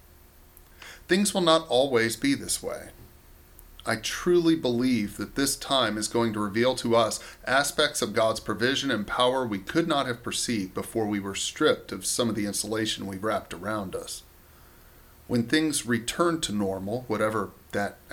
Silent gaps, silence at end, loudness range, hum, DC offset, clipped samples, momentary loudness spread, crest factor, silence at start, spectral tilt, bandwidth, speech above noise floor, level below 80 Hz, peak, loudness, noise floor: none; 0 s; 5 LU; none; under 0.1%; under 0.1%; 10 LU; 22 dB; 0.8 s; -3.5 dB/octave; 19 kHz; 27 dB; -54 dBFS; -6 dBFS; -26 LUFS; -53 dBFS